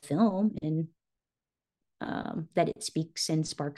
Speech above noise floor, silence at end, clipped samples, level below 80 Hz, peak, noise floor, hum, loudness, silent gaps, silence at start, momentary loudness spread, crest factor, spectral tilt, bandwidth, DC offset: over 60 dB; 0.05 s; under 0.1%; -66 dBFS; -12 dBFS; under -90 dBFS; none; -31 LUFS; none; 0.05 s; 10 LU; 20 dB; -5.5 dB/octave; 12.5 kHz; under 0.1%